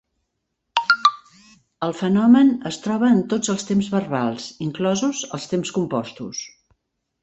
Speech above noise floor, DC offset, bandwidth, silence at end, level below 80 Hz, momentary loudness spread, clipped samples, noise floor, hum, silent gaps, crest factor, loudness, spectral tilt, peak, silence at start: 56 dB; under 0.1%; 8.2 kHz; 0.75 s; -62 dBFS; 14 LU; under 0.1%; -76 dBFS; none; none; 20 dB; -21 LUFS; -5 dB/octave; -2 dBFS; 0.75 s